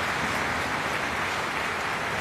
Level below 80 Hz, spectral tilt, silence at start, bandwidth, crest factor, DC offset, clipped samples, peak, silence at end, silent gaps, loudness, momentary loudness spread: -50 dBFS; -3 dB/octave; 0 s; 15.5 kHz; 14 dB; under 0.1%; under 0.1%; -14 dBFS; 0 s; none; -27 LUFS; 1 LU